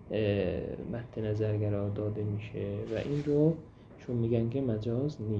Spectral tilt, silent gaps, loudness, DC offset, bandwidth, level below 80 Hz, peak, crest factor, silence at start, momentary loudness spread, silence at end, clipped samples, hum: -9.5 dB/octave; none; -32 LUFS; under 0.1%; 7 kHz; -54 dBFS; -14 dBFS; 18 dB; 0 s; 9 LU; 0 s; under 0.1%; none